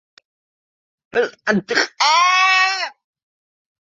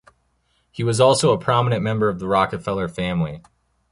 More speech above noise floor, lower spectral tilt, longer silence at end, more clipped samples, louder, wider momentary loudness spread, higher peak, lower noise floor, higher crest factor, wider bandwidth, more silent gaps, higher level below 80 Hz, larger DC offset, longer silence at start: first, over 72 dB vs 46 dB; second, -2 dB/octave vs -5.5 dB/octave; first, 1.05 s vs 0.5 s; neither; first, -16 LUFS vs -20 LUFS; about the same, 11 LU vs 11 LU; about the same, -2 dBFS vs -2 dBFS; first, under -90 dBFS vs -66 dBFS; about the same, 18 dB vs 18 dB; second, 7.8 kHz vs 11.5 kHz; neither; second, -66 dBFS vs -48 dBFS; neither; first, 1.15 s vs 0.75 s